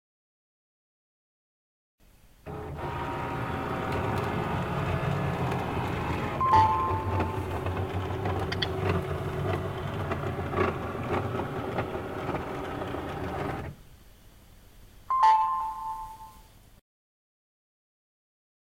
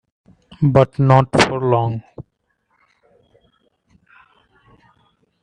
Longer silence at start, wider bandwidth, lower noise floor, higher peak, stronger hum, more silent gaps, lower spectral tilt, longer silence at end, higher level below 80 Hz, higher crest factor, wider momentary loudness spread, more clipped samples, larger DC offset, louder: first, 2.45 s vs 0.6 s; first, 16.5 kHz vs 10.5 kHz; second, -53 dBFS vs -68 dBFS; second, -10 dBFS vs 0 dBFS; neither; neither; about the same, -7 dB/octave vs -6.5 dB/octave; second, 2.2 s vs 3.2 s; about the same, -50 dBFS vs -48 dBFS; about the same, 22 dB vs 20 dB; second, 12 LU vs 19 LU; neither; neither; second, -30 LUFS vs -16 LUFS